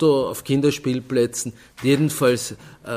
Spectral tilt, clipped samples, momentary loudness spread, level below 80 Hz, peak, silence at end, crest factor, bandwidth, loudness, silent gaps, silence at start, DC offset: -5 dB/octave; under 0.1%; 11 LU; -56 dBFS; -6 dBFS; 0 s; 16 dB; 16 kHz; -21 LUFS; none; 0 s; under 0.1%